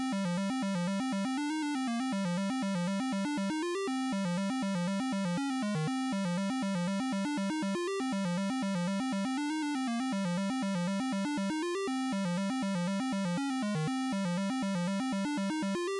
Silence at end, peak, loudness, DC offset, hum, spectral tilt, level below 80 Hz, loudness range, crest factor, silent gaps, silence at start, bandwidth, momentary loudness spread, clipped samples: 0 s; -30 dBFS; -33 LUFS; under 0.1%; none; -5.5 dB/octave; -76 dBFS; 0 LU; 4 dB; none; 0 s; 11.5 kHz; 1 LU; under 0.1%